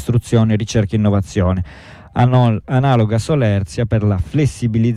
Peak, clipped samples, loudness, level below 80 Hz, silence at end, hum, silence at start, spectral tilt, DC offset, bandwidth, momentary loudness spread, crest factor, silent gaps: -2 dBFS; under 0.1%; -16 LUFS; -36 dBFS; 0 s; none; 0 s; -7.5 dB/octave; under 0.1%; 11.5 kHz; 5 LU; 12 dB; none